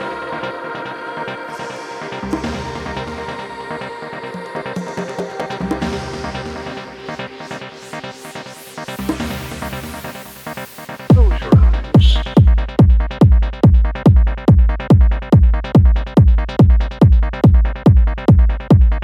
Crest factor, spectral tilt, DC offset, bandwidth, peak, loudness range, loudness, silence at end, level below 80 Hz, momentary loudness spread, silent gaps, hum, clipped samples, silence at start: 14 dB; -8 dB/octave; under 0.1%; 14 kHz; 0 dBFS; 14 LU; -15 LUFS; 0 s; -18 dBFS; 16 LU; none; none; under 0.1%; 0 s